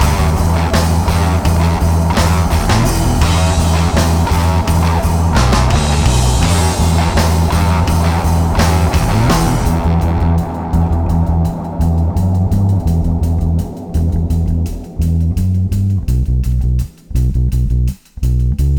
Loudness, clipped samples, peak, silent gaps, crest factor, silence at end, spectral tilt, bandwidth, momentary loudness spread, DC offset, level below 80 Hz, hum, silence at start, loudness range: -14 LUFS; under 0.1%; -2 dBFS; none; 10 dB; 0 s; -6 dB/octave; 19.5 kHz; 5 LU; 1%; -18 dBFS; none; 0 s; 4 LU